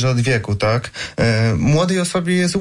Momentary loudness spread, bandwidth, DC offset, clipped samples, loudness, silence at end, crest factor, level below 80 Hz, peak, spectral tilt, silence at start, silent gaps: 4 LU; 11.5 kHz; under 0.1%; under 0.1%; -17 LUFS; 0 s; 10 dB; -40 dBFS; -6 dBFS; -5.5 dB/octave; 0 s; none